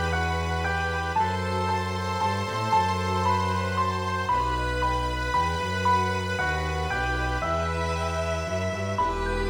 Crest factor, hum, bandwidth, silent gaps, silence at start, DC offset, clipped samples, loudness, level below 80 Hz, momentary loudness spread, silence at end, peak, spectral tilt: 14 dB; none; over 20 kHz; none; 0 s; under 0.1%; under 0.1%; -26 LUFS; -36 dBFS; 4 LU; 0 s; -12 dBFS; -5 dB/octave